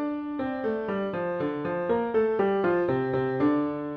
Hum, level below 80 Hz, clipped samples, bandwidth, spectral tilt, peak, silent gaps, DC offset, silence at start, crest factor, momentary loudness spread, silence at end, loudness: none; -60 dBFS; under 0.1%; 5.4 kHz; -9.5 dB/octave; -14 dBFS; none; under 0.1%; 0 s; 14 dB; 5 LU; 0 s; -27 LUFS